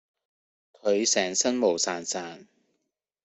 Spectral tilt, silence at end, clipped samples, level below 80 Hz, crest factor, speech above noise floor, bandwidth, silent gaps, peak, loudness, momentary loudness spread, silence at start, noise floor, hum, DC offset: -2 dB/octave; 0.8 s; under 0.1%; -74 dBFS; 20 dB; 54 dB; 8.4 kHz; none; -8 dBFS; -25 LUFS; 10 LU; 0.85 s; -81 dBFS; none; under 0.1%